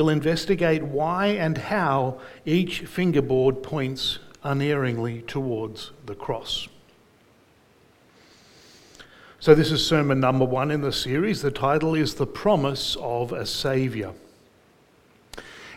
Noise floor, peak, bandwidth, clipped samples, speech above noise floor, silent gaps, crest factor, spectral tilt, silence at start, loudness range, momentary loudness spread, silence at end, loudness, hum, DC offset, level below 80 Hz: -58 dBFS; -2 dBFS; 16.5 kHz; under 0.1%; 35 dB; none; 22 dB; -6 dB/octave; 0 s; 11 LU; 11 LU; 0 s; -24 LUFS; none; under 0.1%; -50 dBFS